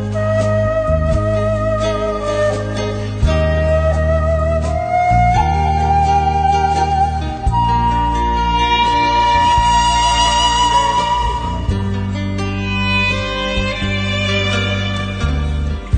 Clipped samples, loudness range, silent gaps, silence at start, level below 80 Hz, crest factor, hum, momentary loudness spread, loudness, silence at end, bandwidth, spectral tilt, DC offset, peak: under 0.1%; 4 LU; none; 0 s; -22 dBFS; 12 dB; none; 7 LU; -16 LUFS; 0 s; 9.2 kHz; -5 dB/octave; under 0.1%; -2 dBFS